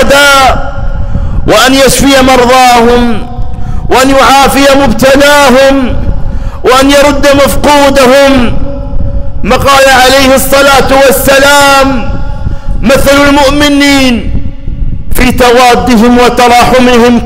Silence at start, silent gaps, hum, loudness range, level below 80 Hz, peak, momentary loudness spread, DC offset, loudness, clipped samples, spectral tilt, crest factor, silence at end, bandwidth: 0 s; none; none; 2 LU; -14 dBFS; 0 dBFS; 14 LU; under 0.1%; -4 LUFS; 0.7%; -4 dB/octave; 4 dB; 0 s; 16.5 kHz